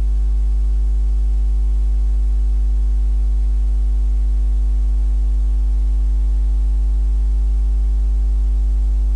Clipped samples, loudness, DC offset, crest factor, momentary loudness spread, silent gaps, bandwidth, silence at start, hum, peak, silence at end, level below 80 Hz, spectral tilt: under 0.1%; -20 LUFS; under 0.1%; 4 dB; 0 LU; none; 1.2 kHz; 0 s; 50 Hz at -15 dBFS; -12 dBFS; 0 s; -16 dBFS; -8.5 dB/octave